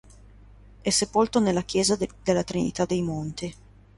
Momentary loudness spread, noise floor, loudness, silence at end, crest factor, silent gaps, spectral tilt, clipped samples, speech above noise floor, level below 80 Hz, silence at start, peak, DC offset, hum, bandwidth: 10 LU; -50 dBFS; -25 LUFS; 0.45 s; 18 dB; none; -4.5 dB/octave; under 0.1%; 25 dB; -50 dBFS; 0.85 s; -8 dBFS; under 0.1%; 50 Hz at -45 dBFS; 11.5 kHz